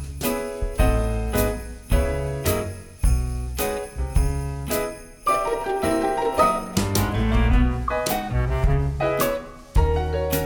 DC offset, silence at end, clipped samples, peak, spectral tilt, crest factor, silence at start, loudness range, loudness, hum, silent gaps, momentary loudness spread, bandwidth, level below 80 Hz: under 0.1%; 0 s; under 0.1%; -6 dBFS; -5.5 dB/octave; 16 dB; 0 s; 4 LU; -24 LUFS; none; none; 7 LU; over 20 kHz; -26 dBFS